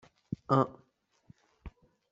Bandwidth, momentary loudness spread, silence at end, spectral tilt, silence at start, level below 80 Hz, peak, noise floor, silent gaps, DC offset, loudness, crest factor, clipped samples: 7.6 kHz; 25 LU; 0.4 s; -7.5 dB/octave; 0.3 s; -60 dBFS; -10 dBFS; -71 dBFS; none; under 0.1%; -32 LUFS; 26 dB; under 0.1%